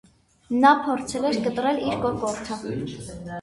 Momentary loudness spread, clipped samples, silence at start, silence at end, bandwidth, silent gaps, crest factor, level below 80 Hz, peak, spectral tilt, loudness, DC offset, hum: 14 LU; under 0.1%; 0.5 s; 0 s; 11.5 kHz; none; 20 dB; -52 dBFS; -4 dBFS; -5 dB/octave; -23 LUFS; under 0.1%; none